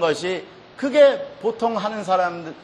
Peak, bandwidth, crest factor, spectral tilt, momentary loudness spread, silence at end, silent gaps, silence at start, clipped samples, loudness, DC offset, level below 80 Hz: -4 dBFS; 10.5 kHz; 18 dB; -4.5 dB/octave; 12 LU; 0 s; none; 0 s; under 0.1%; -21 LUFS; under 0.1%; -66 dBFS